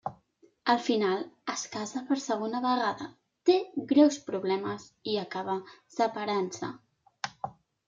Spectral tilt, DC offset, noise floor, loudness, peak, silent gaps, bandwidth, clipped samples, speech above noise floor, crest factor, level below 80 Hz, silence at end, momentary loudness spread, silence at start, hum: -4.5 dB/octave; under 0.1%; -64 dBFS; -30 LUFS; -10 dBFS; none; 7.6 kHz; under 0.1%; 35 dB; 20 dB; -76 dBFS; 0.4 s; 14 LU; 0.05 s; none